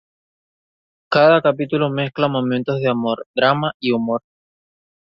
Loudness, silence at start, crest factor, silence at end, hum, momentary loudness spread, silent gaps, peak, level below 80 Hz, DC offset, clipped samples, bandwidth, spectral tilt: -18 LUFS; 1.1 s; 18 dB; 0.85 s; none; 8 LU; 3.26-3.34 s, 3.74-3.80 s; -2 dBFS; -62 dBFS; under 0.1%; under 0.1%; 7 kHz; -8.5 dB/octave